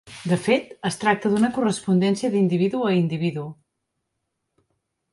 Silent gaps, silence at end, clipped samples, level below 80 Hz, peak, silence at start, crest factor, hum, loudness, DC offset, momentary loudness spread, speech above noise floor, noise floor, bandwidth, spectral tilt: none; 1.6 s; under 0.1%; -64 dBFS; -6 dBFS; 0.05 s; 18 dB; none; -22 LUFS; under 0.1%; 6 LU; 57 dB; -78 dBFS; 11.5 kHz; -6 dB/octave